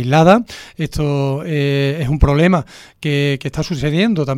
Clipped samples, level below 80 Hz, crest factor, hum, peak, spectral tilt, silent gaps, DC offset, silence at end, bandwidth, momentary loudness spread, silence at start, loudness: under 0.1%; -28 dBFS; 16 dB; none; 0 dBFS; -7 dB/octave; none; under 0.1%; 0 s; 13.5 kHz; 12 LU; 0 s; -16 LUFS